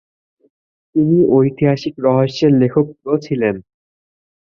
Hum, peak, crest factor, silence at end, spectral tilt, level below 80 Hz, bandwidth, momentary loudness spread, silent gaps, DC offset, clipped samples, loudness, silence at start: none; -2 dBFS; 14 dB; 0.95 s; -8.5 dB/octave; -54 dBFS; 7 kHz; 8 LU; none; under 0.1%; under 0.1%; -15 LUFS; 0.95 s